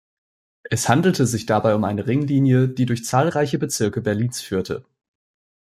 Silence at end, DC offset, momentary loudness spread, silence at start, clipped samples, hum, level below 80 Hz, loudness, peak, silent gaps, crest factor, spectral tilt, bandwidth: 1 s; under 0.1%; 8 LU; 0.65 s; under 0.1%; none; -56 dBFS; -20 LUFS; -2 dBFS; none; 18 dB; -6 dB/octave; 15 kHz